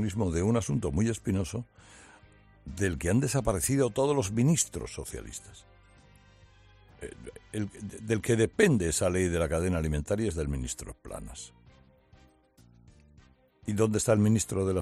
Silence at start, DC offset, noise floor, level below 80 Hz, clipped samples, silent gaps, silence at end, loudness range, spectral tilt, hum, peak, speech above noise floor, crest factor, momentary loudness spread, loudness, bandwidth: 0 s; under 0.1%; -60 dBFS; -48 dBFS; under 0.1%; none; 0 s; 11 LU; -5.5 dB/octave; none; -8 dBFS; 32 dB; 22 dB; 19 LU; -29 LUFS; 14 kHz